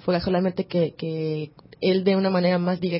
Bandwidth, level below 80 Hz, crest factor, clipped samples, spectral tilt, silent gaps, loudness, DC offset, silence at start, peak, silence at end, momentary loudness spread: 5.8 kHz; -54 dBFS; 16 dB; under 0.1%; -11.5 dB/octave; none; -23 LUFS; under 0.1%; 0.05 s; -8 dBFS; 0 s; 8 LU